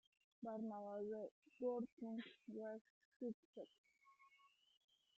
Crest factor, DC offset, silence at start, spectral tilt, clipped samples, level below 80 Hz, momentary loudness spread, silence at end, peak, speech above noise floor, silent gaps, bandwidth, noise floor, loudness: 18 dB; under 0.1%; 0.4 s; -5.5 dB/octave; under 0.1%; under -90 dBFS; 11 LU; 0.7 s; -34 dBFS; 25 dB; 1.31-1.42 s, 1.92-1.97 s, 2.81-3.20 s, 3.34-3.53 s, 3.78-3.84 s; 7.6 kHz; -76 dBFS; -51 LUFS